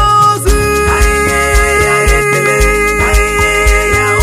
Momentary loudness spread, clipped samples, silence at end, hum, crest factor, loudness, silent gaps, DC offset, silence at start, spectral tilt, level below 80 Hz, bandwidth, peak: 1 LU; under 0.1%; 0 s; none; 10 dB; -9 LUFS; none; under 0.1%; 0 s; -4 dB/octave; -16 dBFS; 16 kHz; 0 dBFS